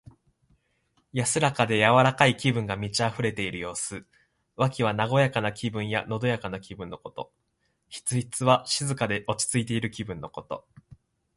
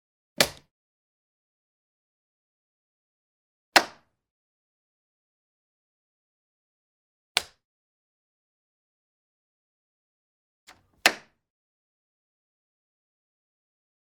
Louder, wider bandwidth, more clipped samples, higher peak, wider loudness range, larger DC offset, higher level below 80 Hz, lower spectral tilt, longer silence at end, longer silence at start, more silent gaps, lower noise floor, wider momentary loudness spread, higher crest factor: about the same, -26 LUFS vs -24 LUFS; second, 11.5 kHz vs 16 kHz; neither; second, -4 dBFS vs 0 dBFS; about the same, 5 LU vs 7 LU; neither; first, -58 dBFS vs -70 dBFS; first, -4.5 dB/octave vs -0.5 dB/octave; second, 0.75 s vs 3 s; first, 1.15 s vs 0.4 s; second, none vs 0.71-3.72 s, 4.31-7.35 s, 7.64-10.67 s; first, -74 dBFS vs -43 dBFS; first, 17 LU vs 10 LU; second, 24 dB vs 36 dB